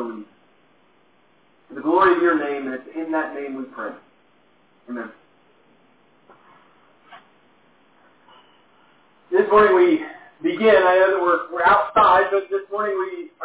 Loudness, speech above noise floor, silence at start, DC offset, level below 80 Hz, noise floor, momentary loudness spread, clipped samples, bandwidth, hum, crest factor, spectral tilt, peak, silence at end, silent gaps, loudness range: -19 LUFS; 41 dB; 0 s; under 0.1%; -58 dBFS; -59 dBFS; 19 LU; under 0.1%; 4 kHz; none; 18 dB; -8.5 dB/octave; -2 dBFS; 0 s; none; 25 LU